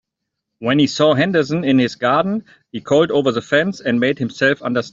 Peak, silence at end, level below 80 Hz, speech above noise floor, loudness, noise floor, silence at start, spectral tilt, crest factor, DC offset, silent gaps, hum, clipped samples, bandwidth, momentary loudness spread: -2 dBFS; 0.05 s; -58 dBFS; 62 dB; -17 LUFS; -79 dBFS; 0.6 s; -6 dB/octave; 16 dB; under 0.1%; none; none; under 0.1%; 7.8 kHz; 8 LU